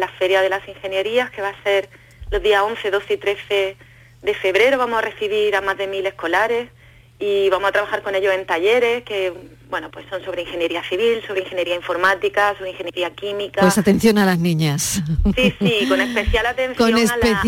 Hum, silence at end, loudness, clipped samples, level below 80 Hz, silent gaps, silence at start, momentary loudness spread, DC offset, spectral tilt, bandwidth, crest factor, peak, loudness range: none; 0 s; -19 LUFS; under 0.1%; -36 dBFS; none; 0 s; 11 LU; under 0.1%; -4.5 dB/octave; 17 kHz; 16 dB; -4 dBFS; 4 LU